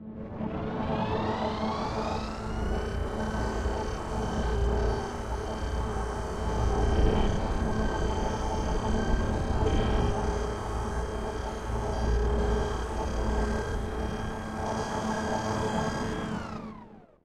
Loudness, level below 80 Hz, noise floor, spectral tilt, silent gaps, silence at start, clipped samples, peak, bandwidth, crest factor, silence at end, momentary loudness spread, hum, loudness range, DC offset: -31 LUFS; -32 dBFS; -49 dBFS; -6 dB/octave; none; 0 s; under 0.1%; -12 dBFS; 11.5 kHz; 18 dB; 0.2 s; 6 LU; none; 3 LU; under 0.1%